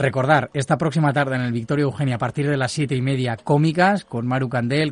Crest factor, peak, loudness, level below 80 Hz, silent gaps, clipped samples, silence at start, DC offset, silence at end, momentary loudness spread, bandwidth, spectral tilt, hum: 16 dB; -4 dBFS; -21 LUFS; -56 dBFS; none; under 0.1%; 0 s; under 0.1%; 0 s; 5 LU; 11 kHz; -6.5 dB/octave; none